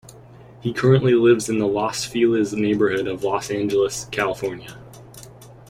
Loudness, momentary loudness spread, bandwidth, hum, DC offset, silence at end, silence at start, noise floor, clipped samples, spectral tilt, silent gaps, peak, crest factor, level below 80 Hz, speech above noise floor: -20 LUFS; 13 LU; 16 kHz; none; under 0.1%; 0.15 s; 0.05 s; -44 dBFS; under 0.1%; -5.5 dB/octave; none; -4 dBFS; 18 dB; -52 dBFS; 25 dB